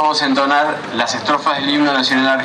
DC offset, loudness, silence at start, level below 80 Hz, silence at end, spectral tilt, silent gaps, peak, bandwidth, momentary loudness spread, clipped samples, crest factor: under 0.1%; -15 LUFS; 0 s; -62 dBFS; 0 s; -3 dB/octave; none; 0 dBFS; 11 kHz; 5 LU; under 0.1%; 14 dB